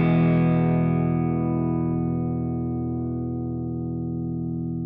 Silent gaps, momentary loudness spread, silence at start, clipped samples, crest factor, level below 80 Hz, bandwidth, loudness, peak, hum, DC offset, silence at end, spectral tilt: none; 9 LU; 0 s; under 0.1%; 14 dB; -48 dBFS; 3.9 kHz; -25 LUFS; -10 dBFS; none; under 0.1%; 0 s; -13 dB/octave